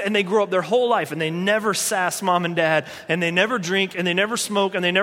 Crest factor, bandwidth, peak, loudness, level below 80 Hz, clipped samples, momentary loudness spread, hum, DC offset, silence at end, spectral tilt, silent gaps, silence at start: 18 dB; 16.5 kHz; -4 dBFS; -21 LUFS; -68 dBFS; under 0.1%; 3 LU; none; under 0.1%; 0 s; -3.5 dB/octave; none; 0 s